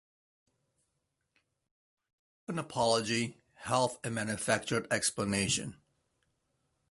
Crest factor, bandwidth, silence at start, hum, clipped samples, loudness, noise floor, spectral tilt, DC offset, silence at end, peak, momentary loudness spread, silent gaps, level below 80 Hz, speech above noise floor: 24 dB; 12 kHz; 2.5 s; none; under 0.1%; -32 LUFS; -82 dBFS; -3.5 dB/octave; under 0.1%; 1.15 s; -12 dBFS; 10 LU; none; -64 dBFS; 50 dB